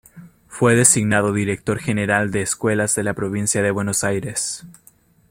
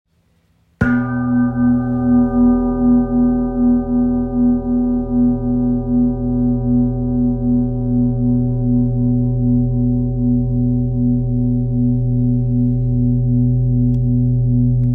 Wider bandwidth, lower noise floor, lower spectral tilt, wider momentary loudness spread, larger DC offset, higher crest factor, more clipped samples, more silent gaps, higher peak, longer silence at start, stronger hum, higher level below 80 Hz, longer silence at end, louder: first, 16.5 kHz vs 2.3 kHz; second, -54 dBFS vs -59 dBFS; second, -4 dB/octave vs -12.5 dB/octave; first, 10 LU vs 3 LU; neither; first, 20 dB vs 14 dB; neither; neither; about the same, 0 dBFS vs -2 dBFS; second, 0.15 s vs 0.8 s; neither; second, -52 dBFS vs -28 dBFS; first, 0.6 s vs 0 s; second, -19 LUFS vs -16 LUFS